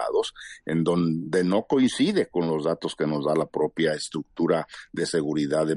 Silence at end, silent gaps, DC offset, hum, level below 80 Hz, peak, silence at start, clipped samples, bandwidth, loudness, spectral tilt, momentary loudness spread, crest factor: 0 s; none; under 0.1%; none; -62 dBFS; -8 dBFS; 0 s; under 0.1%; 11.5 kHz; -25 LUFS; -5.5 dB/octave; 7 LU; 16 dB